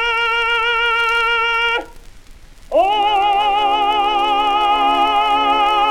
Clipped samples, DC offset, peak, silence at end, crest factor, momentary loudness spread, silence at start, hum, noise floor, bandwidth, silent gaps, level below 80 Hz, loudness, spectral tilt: under 0.1%; under 0.1%; -4 dBFS; 0 s; 12 dB; 2 LU; 0 s; none; -39 dBFS; 14 kHz; none; -40 dBFS; -15 LUFS; -2 dB/octave